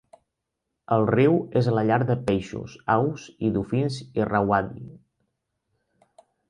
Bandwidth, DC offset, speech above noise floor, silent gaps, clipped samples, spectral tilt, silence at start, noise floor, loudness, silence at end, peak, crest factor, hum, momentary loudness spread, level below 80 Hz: 10.5 kHz; under 0.1%; 58 dB; none; under 0.1%; -8 dB/octave; 0.9 s; -82 dBFS; -24 LUFS; 1.5 s; -6 dBFS; 18 dB; none; 12 LU; -54 dBFS